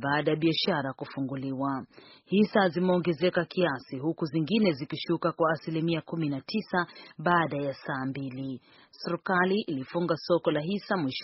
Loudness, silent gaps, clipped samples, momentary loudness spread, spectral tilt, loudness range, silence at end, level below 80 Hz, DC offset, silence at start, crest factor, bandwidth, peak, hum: -29 LUFS; none; under 0.1%; 10 LU; -4.5 dB/octave; 3 LU; 0 s; -68 dBFS; under 0.1%; 0 s; 20 dB; 6 kHz; -10 dBFS; none